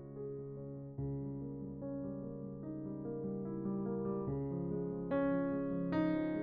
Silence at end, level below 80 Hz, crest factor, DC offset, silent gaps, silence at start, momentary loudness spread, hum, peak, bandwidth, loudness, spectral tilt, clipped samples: 0 s; -62 dBFS; 16 dB; under 0.1%; none; 0 s; 11 LU; none; -24 dBFS; 5.2 kHz; -40 LUFS; -9 dB/octave; under 0.1%